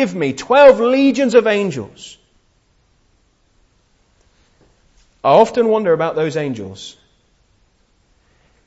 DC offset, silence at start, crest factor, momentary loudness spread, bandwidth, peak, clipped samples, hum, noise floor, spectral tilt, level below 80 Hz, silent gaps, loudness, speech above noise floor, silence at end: under 0.1%; 0 s; 18 dB; 24 LU; 8 kHz; 0 dBFS; under 0.1%; none; -58 dBFS; -5.5 dB/octave; -56 dBFS; none; -14 LUFS; 45 dB; 1.75 s